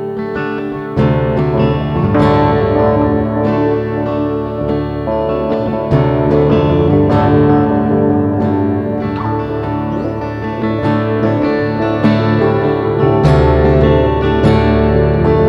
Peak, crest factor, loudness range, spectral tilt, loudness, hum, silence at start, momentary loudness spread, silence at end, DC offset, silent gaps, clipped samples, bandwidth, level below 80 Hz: 0 dBFS; 12 dB; 4 LU; -9.5 dB/octave; -13 LUFS; none; 0 s; 8 LU; 0 s; under 0.1%; none; under 0.1%; 7.2 kHz; -26 dBFS